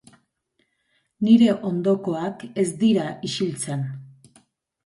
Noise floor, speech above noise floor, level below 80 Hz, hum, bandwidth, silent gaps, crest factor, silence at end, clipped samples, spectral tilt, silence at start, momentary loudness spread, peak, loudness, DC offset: -71 dBFS; 50 dB; -66 dBFS; none; 11.5 kHz; none; 18 dB; 0.8 s; under 0.1%; -6 dB/octave; 1.2 s; 13 LU; -4 dBFS; -22 LUFS; under 0.1%